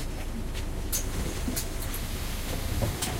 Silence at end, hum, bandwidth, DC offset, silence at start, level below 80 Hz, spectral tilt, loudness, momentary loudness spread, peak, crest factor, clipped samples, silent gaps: 0 s; none; 16.5 kHz; under 0.1%; 0 s; -34 dBFS; -4 dB/octave; -33 LUFS; 5 LU; -14 dBFS; 16 dB; under 0.1%; none